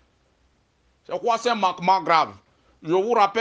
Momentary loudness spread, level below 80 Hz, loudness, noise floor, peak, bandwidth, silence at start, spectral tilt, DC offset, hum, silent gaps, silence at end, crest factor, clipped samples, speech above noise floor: 10 LU; -68 dBFS; -22 LUFS; -64 dBFS; -4 dBFS; 9.4 kHz; 1.1 s; -4.5 dB/octave; under 0.1%; none; none; 0 s; 20 dB; under 0.1%; 43 dB